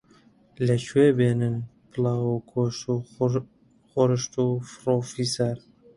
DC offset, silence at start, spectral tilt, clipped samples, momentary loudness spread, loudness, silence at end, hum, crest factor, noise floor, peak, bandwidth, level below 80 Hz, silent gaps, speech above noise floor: under 0.1%; 0.6 s; -6.5 dB/octave; under 0.1%; 10 LU; -25 LUFS; 0.4 s; none; 18 dB; -57 dBFS; -8 dBFS; 11.5 kHz; -60 dBFS; none; 33 dB